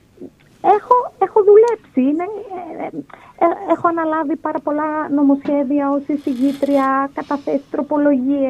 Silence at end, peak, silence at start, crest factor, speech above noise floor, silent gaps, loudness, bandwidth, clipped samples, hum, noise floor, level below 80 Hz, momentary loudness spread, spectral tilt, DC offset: 0 s; 0 dBFS; 0.2 s; 16 dB; 22 dB; none; -17 LUFS; 8.4 kHz; under 0.1%; none; -40 dBFS; -60 dBFS; 11 LU; -7 dB/octave; under 0.1%